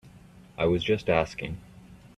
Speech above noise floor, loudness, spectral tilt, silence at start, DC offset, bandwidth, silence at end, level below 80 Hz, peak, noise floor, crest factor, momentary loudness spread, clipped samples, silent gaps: 25 dB; -27 LUFS; -6.5 dB/octave; 0.05 s; under 0.1%; 12.5 kHz; 0.1 s; -50 dBFS; -8 dBFS; -51 dBFS; 20 dB; 16 LU; under 0.1%; none